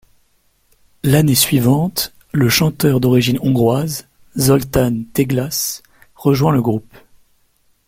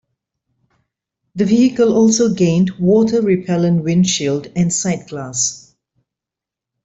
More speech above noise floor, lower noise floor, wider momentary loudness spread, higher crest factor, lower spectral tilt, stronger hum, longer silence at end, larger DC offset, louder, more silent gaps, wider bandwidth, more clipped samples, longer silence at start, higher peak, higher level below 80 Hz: second, 44 dB vs 71 dB; second, -59 dBFS vs -86 dBFS; about the same, 10 LU vs 8 LU; about the same, 16 dB vs 14 dB; about the same, -5 dB/octave vs -5.5 dB/octave; neither; second, 1.05 s vs 1.25 s; neither; about the same, -16 LUFS vs -15 LUFS; neither; first, 16.5 kHz vs 8.2 kHz; neither; second, 1.05 s vs 1.35 s; first, 0 dBFS vs -4 dBFS; first, -42 dBFS vs -54 dBFS